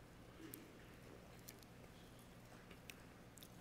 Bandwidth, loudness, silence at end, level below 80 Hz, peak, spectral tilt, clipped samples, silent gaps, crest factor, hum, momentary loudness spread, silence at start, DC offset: 16 kHz; -59 LUFS; 0 s; -70 dBFS; -30 dBFS; -4 dB/octave; under 0.1%; none; 30 dB; none; 5 LU; 0 s; under 0.1%